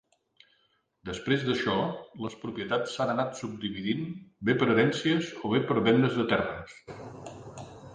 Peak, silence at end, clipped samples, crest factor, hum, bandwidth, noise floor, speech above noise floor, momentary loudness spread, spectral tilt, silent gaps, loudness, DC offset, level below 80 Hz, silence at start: -10 dBFS; 0 s; under 0.1%; 20 dB; none; 9.8 kHz; -71 dBFS; 43 dB; 20 LU; -6 dB/octave; none; -28 LUFS; under 0.1%; -60 dBFS; 1.05 s